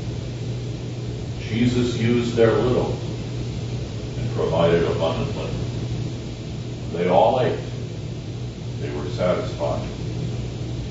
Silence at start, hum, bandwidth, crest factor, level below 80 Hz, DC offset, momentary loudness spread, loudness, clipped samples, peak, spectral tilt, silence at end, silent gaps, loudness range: 0 s; none; 8 kHz; 18 dB; -38 dBFS; under 0.1%; 12 LU; -24 LUFS; under 0.1%; -4 dBFS; -7 dB/octave; 0 s; none; 2 LU